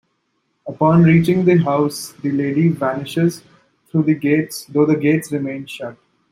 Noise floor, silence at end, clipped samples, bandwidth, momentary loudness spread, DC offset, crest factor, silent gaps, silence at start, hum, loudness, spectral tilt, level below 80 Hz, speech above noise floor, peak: -68 dBFS; 0.4 s; under 0.1%; 15 kHz; 16 LU; under 0.1%; 16 dB; none; 0.65 s; none; -17 LUFS; -7 dB/octave; -54 dBFS; 52 dB; -2 dBFS